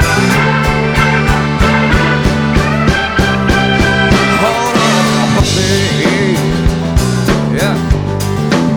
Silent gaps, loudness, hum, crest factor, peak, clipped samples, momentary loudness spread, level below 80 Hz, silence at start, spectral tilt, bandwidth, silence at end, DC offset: none; -11 LUFS; none; 10 dB; 0 dBFS; under 0.1%; 3 LU; -22 dBFS; 0 s; -5 dB/octave; over 20 kHz; 0 s; 0.2%